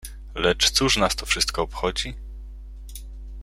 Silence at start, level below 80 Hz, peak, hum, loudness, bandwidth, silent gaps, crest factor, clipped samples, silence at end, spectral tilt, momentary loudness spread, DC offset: 0 s; -36 dBFS; -6 dBFS; none; -22 LUFS; 16.5 kHz; none; 20 dB; under 0.1%; 0 s; -2.5 dB/octave; 22 LU; under 0.1%